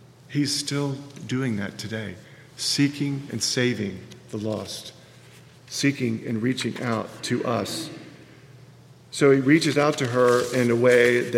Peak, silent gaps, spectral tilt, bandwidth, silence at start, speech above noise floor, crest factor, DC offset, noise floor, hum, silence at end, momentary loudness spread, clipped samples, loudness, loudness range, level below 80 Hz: -4 dBFS; none; -4.5 dB/octave; 16 kHz; 0.3 s; 26 dB; 20 dB; under 0.1%; -49 dBFS; none; 0 s; 17 LU; under 0.1%; -23 LUFS; 6 LU; -66 dBFS